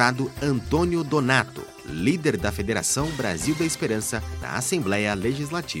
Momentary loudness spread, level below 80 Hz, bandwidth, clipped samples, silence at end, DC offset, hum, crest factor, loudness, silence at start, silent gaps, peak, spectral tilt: 6 LU; -42 dBFS; 16.5 kHz; under 0.1%; 0 s; under 0.1%; none; 22 dB; -24 LUFS; 0 s; none; -2 dBFS; -4.5 dB/octave